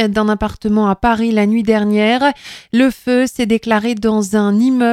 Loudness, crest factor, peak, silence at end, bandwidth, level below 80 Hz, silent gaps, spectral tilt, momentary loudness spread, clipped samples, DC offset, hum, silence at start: -15 LUFS; 14 dB; 0 dBFS; 0 s; 13.5 kHz; -40 dBFS; none; -5.5 dB/octave; 4 LU; under 0.1%; under 0.1%; none; 0 s